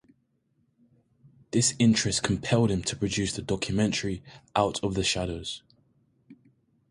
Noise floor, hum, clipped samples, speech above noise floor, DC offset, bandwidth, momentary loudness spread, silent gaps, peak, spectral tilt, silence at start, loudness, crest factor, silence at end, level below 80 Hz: -71 dBFS; none; under 0.1%; 44 dB; under 0.1%; 11.5 kHz; 12 LU; none; -8 dBFS; -4 dB/octave; 1.55 s; -27 LUFS; 20 dB; 0.55 s; -50 dBFS